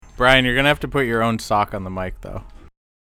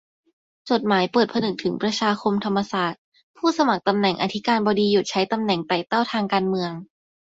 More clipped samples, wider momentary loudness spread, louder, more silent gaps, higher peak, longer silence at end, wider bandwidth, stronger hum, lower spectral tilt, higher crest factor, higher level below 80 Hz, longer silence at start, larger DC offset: neither; first, 19 LU vs 5 LU; first, -18 LUFS vs -22 LUFS; second, none vs 2.98-3.12 s, 3.23-3.34 s; first, 0 dBFS vs -4 dBFS; about the same, 0.45 s vs 0.55 s; first, 17.5 kHz vs 7.8 kHz; neither; about the same, -5 dB/octave vs -5 dB/octave; about the same, 20 dB vs 18 dB; first, -36 dBFS vs -64 dBFS; second, 0.15 s vs 0.65 s; neither